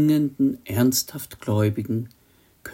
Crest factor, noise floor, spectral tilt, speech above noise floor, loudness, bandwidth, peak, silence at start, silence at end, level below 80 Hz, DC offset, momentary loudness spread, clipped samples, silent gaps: 14 dB; -46 dBFS; -5.5 dB/octave; 24 dB; -23 LUFS; 16.5 kHz; -8 dBFS; 0 s; 0 s; -58 dBFS; under 0.1%; 12 LU; under 0.1%; none